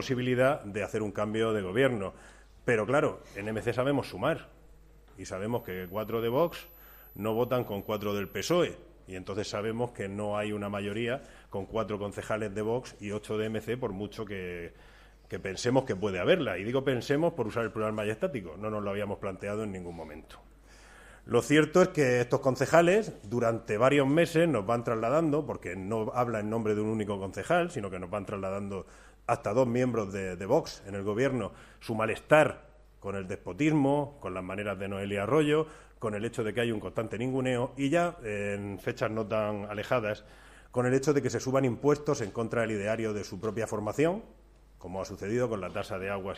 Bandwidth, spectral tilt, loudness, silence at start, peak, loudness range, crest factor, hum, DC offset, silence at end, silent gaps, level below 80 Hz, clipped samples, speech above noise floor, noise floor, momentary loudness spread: 15 kHz; -6 dB/octave; -30 LUFS; 0 s; -8 dBFS; 7 LU; 24 dB; none; under 0.1%; 0 s; none; -56 dBFS; under 0.1%; 25 dB; -55 dBFS; 13 LU